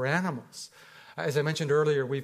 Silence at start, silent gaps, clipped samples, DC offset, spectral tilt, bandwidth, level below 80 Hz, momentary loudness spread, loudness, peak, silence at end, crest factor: 0 s; none; under 0.1%; under 0.1%; -5.5 dB/octave; 15.5 kHz; -74 dBFS; 18 LU; -28 LUFS; -12 dBFS; 0 s; 18 dB